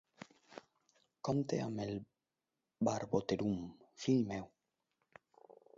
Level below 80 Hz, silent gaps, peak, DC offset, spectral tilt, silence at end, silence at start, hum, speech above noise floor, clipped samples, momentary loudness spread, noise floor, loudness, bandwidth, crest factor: -70 dBFS; none; -20 dBFS; under 0.1%; -6.5 dB/octave; 1.3 s; 0.5 s; none; over 53 dB; under 0.1%; 22 LU; under -90 dBFS; -38 LUFS; 7.6 kHz; 22 dB